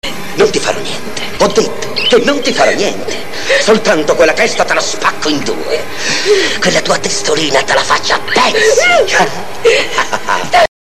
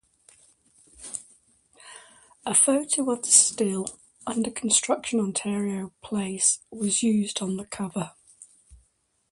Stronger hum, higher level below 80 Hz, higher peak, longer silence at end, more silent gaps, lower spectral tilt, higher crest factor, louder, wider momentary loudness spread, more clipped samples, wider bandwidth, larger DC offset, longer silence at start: neither; first, -42 dBFS vs -64 dBFS; about the same, 0 dBFS vs -2 dBFS; second, 0.25 s vs 0.55 s; neither; about the same, -2.5 dB/octave vs -3 dB/octave; second, 12 dB vs 26 dB; first, -11 LUFS vs -23 LUFS; second, 8 LU vs 19 LU; neither; first, 15 kHz vs 11.5 kHz; first, 9% vs under 0.1%; second, 0 s vs 1 s